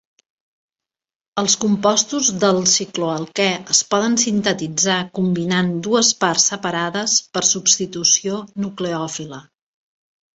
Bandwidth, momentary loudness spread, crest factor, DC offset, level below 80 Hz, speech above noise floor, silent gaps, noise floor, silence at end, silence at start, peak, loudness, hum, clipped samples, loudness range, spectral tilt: 8.2 kHz; 9 LU; 18 dB; under 0.1%; -60 dBFS; over 71 dB; none; under -90 dBFS; 0.95 s; 1.35 s; -2 dBFS; -17 LUFS; none; under 0.1%; 2 LU; -2.5 dB/octave